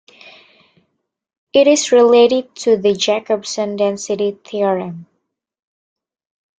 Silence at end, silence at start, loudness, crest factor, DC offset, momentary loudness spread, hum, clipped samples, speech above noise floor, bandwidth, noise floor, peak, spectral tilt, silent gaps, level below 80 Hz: 1.55 s; 0.25 s; -15 LUFS; 16 dB; under 0.1%; 11 LU; none; under 0.1%; 57 dB; 9.2 kHz; -71 dBFS; -2 dBFS; -3.5 dB/octave; 1.37-1.47 s; -64 dBFS